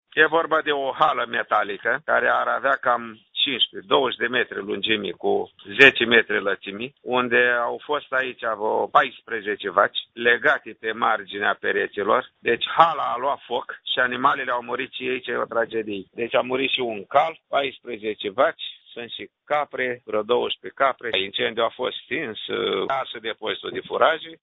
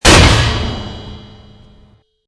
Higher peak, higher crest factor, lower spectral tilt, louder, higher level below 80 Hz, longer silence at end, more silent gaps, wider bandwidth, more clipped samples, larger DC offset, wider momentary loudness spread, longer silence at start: about the same, 0 dBFS vs 0 dBFS; first, 22 dB vs 14 dB; first, -5 dB/octave vs -3.5 dB/octave; second, -22 LUFS vs -11 LUFS; second, -64 dBFS vs -20 dBFS; second, 0.1 s vs 1.1 s; neither; second, 8 kHz vs 11 kHz; second, under 0.1% vs 0.5%; neither; second, 11 LU vs 24 LU; about the same, 0.15 s vs 0.05 s